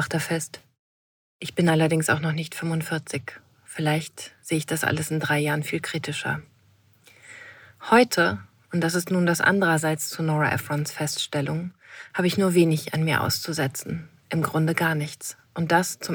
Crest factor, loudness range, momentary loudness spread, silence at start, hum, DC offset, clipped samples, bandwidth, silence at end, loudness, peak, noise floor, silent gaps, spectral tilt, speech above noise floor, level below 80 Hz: 22 dB; 4 LU; 16 LU; 0 s; none; under 0.1%; under 0.1%; 20 kHz; 0 s; -24 LUFS; -4 dBFS; -60 dBFS; 0.79-1.40 s; -5 dB/octave; 35 dB; -64 dBFS